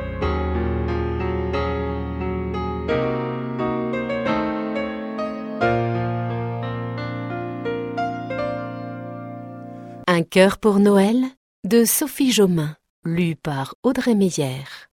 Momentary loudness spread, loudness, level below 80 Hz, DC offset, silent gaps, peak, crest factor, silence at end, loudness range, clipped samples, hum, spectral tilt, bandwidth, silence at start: 13 LU; -22 LUFS; -36 dBFS; under 0.1%; 11.37-11.63 s, 12.90-13.03 s, 13.75-13.83 s; -2 dBFS; 20 dB; 0.1 s; 8 LU; under 0.1%; none; -5.5 dB/octave; 16 kHz; 0 s